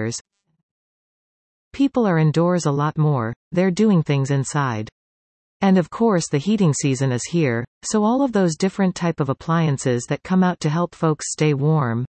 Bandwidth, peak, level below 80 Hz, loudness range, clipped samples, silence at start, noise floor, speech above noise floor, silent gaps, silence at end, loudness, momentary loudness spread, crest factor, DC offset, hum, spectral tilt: 8.8 kHz; -4 dBFS; -58 dBFS; 2 LU; under 0.1%; 0 s; under -90 dBFS; over 71 dB; 0.21-0.25 s, 0.63-1.71 s, 3.36-3.51 s, 4.92-5.60 s, 7.67-7.81 s; 0.05 s; -20 LUFS; 6 LU; 16 dB; under 0.1%; none; -6 dB/octave